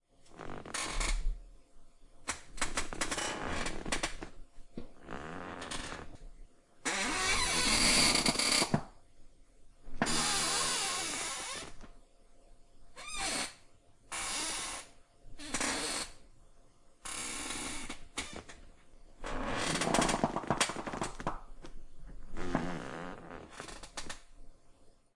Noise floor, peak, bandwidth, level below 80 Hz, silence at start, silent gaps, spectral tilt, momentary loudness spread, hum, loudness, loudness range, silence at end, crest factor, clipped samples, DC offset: -59 dBFS; -12 dBFS; 11.5 kHz; -46 dBFS; 0.2 s; none; -2 dB/octave; 21 LU; none; -33 LUFS; 13 LU; 0.25 s; 24 dB; under 0.1%; under 0.1%